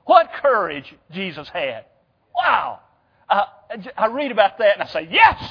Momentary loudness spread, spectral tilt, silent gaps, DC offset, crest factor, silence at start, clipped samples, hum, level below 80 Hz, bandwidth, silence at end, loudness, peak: 17 LU; -6 dB/octave; none; under 0.1%; 20 dB; 0.05 s; under 0.1%; none; -54 dBFS; 5.4 kHz; 0 s; -19 LUFS; 0 dBFS